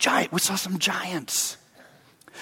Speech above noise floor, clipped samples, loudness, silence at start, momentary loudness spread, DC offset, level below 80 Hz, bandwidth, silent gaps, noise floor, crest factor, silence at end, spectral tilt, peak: 28 dB; under 0.1%; -24 LUFS; 0 s; 7 LU; under 0.1%; -70 dBFS; 17 kHz; none; -54 dBFS; 20 dB; 0 s; -2 dB/octave; -8 dBFS